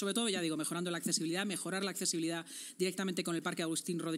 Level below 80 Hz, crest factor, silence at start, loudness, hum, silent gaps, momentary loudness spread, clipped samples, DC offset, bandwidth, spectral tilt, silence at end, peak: under -90 dBFS; 20 dB; 0 s; -36 LUFS; none; none; 4 LU; under 0.1%; under 0.1%; 16 kHz; -3.5 dB/octave; 0 s; -16 dBFS